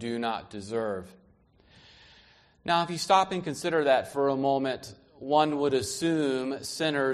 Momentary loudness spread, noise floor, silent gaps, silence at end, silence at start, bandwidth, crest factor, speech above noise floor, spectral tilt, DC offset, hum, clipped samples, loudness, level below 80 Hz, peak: 12 LU; -61 dBFS; none; 0 s; 0 s; 13 kHz; 20 dB; 34 dB; -4.5 dB/octave; under 0.1%; none; under 0.1%; -28 LUFS; -64 dBFS; -8 dBFS